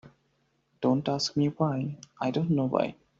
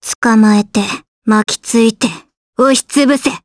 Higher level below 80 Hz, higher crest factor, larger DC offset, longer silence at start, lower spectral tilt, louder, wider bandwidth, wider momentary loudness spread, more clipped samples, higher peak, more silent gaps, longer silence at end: second, -66 dBFS vs -54 dBFS; first, 20 dB vs 12 dB; neither; about the same, 0.05 s vs 0 s; first, -6.5 dB/octave vs -4 dB/octave; second, -29 LUFS vs -12 LUFS; second, 7.6 kHz vs 11 kHz; second, 6 LU vs 11 LU; neither; second, -10 dBFS vs 0 dBFS; second, none vs 0.15-0.22 s, 1.08-1.22 s, 2.37-2.53 s; first, 0.25 s vs 0.05 s